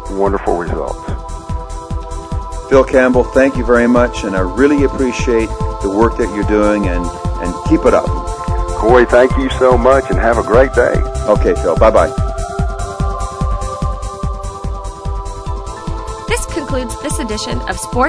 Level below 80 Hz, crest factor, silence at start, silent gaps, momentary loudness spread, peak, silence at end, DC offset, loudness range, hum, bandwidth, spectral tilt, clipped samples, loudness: -22 dBFS; 14 dB; 0 s; none; 14 LU; 0 dBFS; 0 s; under 0.1%; 10 LU; none; 11 kHz; -6 dB/octave; 0.1%; -15 LUFS